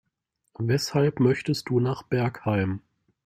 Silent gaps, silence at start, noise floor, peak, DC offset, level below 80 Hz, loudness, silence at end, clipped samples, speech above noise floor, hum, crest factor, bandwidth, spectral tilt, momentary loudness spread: none; 0.6 s; -78 dBFS; -8 dBFS; under 0.1%; -60 dBFS; -25 LUFS; 0.45 s; under 0.1%; 53 dB; none; 16 dB; 15 kHz; -6.5 dB/octave; 7 LU